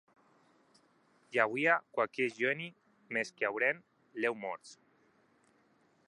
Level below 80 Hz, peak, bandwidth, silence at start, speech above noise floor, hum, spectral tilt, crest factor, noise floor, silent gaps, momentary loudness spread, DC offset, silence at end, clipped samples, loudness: -90 dBFS; -12 dBFS; 11.5 kHz; 1.3 s; 36 dB; none; -4.5 dB/octave; 24 dB; -70 dBFS; none; 13 LU; under 0.1%; 1.35 s; under 0.1%; -33 LUFS